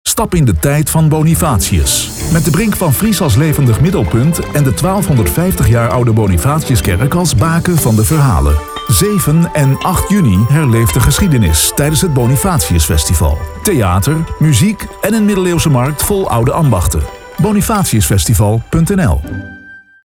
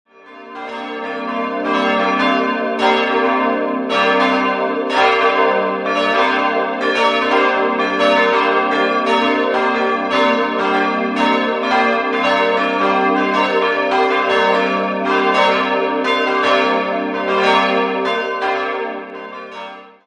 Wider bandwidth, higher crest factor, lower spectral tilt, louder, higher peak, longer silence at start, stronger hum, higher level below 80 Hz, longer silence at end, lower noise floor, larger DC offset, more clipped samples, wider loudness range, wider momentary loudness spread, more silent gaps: first, 19 kHz vs 10 kHz; second, 10 dB vs 16 dB; about the same, -5.5 dB/octave vs -4.5 dB/octave; first, -11 LUFS vs -16 LUFS; about the same, 0 dBFS vs 0 dBFS; second, 0.05 s vs 0.25 s; neither; first, -24 dBFS vs -60 dBFS; about the same, 0.25 s vs 0.15 s; about the same, -36 dBFS vs -37 dBFS; neither; neither; about the same, 2 LU vs 2 LU; second, 4 LU vs 8 LU; neither